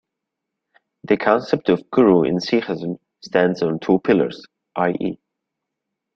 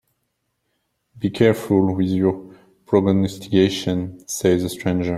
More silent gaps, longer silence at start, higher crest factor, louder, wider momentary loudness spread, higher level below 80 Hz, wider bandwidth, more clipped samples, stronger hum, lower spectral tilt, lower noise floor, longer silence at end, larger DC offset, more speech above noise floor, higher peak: neither; about the same, 1.1 s vs 1.15 s; about the same, 20 dB vs 18 dB; about the same, -19 LUFS vs -20 LUFS; first, 14 LU vs 9 LU; about the same, -58 dBFS vs -54 dBFS; second, 7.4 kHz vs 15.5 kHz; neither; neither; about the same, -7 dB/octave vs -6 dB/octave; first, -81 dBFS vs -73 dBFS; first, 1 s vs 0 s; neither; first, 63 dB vs 54 dB; about the same, -2 dBFS vs -2 dBFS